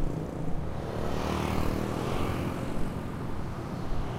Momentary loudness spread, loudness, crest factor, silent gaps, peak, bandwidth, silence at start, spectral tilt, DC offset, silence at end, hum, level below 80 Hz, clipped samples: 6 LU; -33 LUFS; 16 dB; none; -14 dBFS; 16 kHz; 0 s; -6.5 dB/octave; under 0.1%; 0 s; none; -38 dBFS; under 0.1%